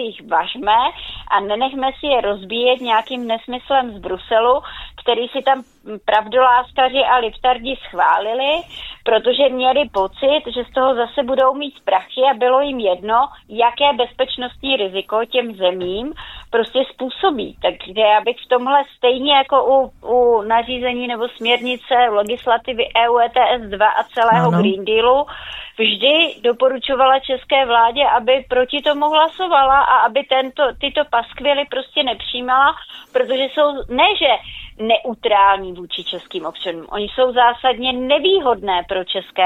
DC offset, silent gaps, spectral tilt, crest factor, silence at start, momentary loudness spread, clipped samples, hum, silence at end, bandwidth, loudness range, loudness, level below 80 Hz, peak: under 0.1%; none; -5.5 dB/octave; 16 dB; 0 s; 9 LU; under 0.1%; none; 0 s; 8 kHz; 4 LU; -17 LUFS; -46 dBFS; 0 dBFS